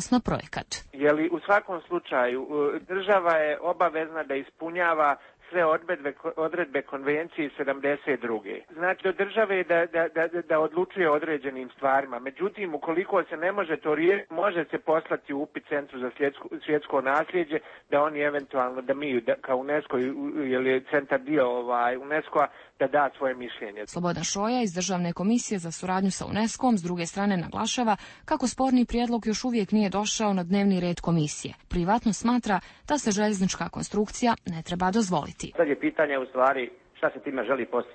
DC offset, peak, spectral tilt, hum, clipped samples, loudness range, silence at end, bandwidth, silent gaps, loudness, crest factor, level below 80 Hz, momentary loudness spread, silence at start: under 0.1%; -10 dBFS; -5 dB/octave; none; under 0.1%; 2 LU; 0 s; 8.8 kHz; none; -27 LUFS; 16 dB; -54 dBFS; 7 LU; 0 s